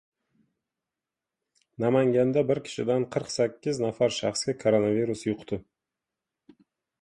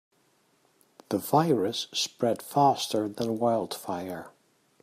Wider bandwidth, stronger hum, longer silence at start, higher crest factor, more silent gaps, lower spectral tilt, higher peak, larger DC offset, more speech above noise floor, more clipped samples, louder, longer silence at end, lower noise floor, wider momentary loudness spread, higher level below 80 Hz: second, 11.5 kHz vs 15.5 kHz; neither; first, 1.8 s vs 1.1 s; about the same, 18 dB vs 20 dB; neither; about the same, -5.5 dB/octave vs -5 dB/octave; about the same, -10 dBFS vs -8 dBFS; neither; first, 63 dB vs 40 dB; neither; about the same, -27 LUFS vs -28 LUFS; first, 1.4 s vs 0.55 s; first, -89 dBFS vs -67 dBFS; second, 8 LU vs 11 LU; first, -64 dBFS vs -74 dBFS